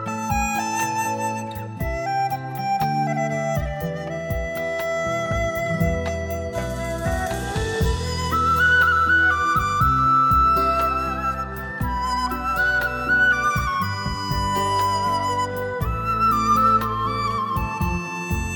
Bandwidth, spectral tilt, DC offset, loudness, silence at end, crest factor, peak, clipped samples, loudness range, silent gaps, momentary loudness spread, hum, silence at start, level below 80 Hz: 17.5 kHz; -4.5 dB/octave; under 0.1%; -21 LUFS; 0 s; 14 dB; -8 dBFS; under 0.1%; 7 LU; none; 10 LU; none; 0 s; -34 dBFS